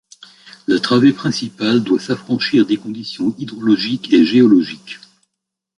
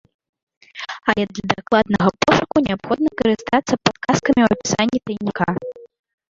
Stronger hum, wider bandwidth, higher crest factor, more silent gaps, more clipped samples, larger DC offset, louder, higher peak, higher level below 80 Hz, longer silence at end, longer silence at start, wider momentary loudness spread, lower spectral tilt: neither; first, 11 kHz vs 7.8 kHz; about the same, 14 dB vs 18 dB; neither; neither; neither; first, -16 LUFS vs -19 LUFS; about the same, -2 dBFS vs 0 dBFS; second, -60 dBFS vs -48 dBFS; first, 0.8 s vs 0.45 s; about the same, 0.7 s vs 0.75 s; first, 15 LU vs 9 LU; about the same, -6 dB/octave vs -5 dB/octave